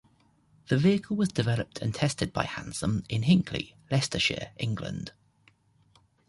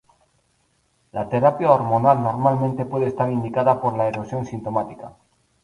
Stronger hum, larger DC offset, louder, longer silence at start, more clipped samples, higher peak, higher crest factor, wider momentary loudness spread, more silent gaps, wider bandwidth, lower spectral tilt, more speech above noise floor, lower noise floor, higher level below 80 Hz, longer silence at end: neither; neither; second, -28 LUFS vs -21 LUFS; second, 0.7 s vs 1.15 s; neither; second, -8 dBFS vs -2 dBFS; about the same, 20 dB vs 20 dB; second, 10 LU vs 13 LU; neither; about the same, 11.5 kHz vs 11 kHz; second, -5.5 dB/octave vs -9 dB/octave; second, 37 dB vs 45 dB; about the same, -64 dBFS vs -65 dBFS; about the same, -52 dBFS vs -56 dBFS; first, 1.2 s vs 0.55 s